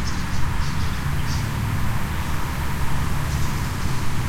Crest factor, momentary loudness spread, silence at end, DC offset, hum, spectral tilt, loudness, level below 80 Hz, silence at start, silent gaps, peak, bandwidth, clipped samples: 12 dB; 2 LU; 0 s; under 0.1%; none; -5 dB/octave; -26 LUFS; -28 dBFS; 0 s; none; -8 dBFS; 16.5 kHz; under 0.1%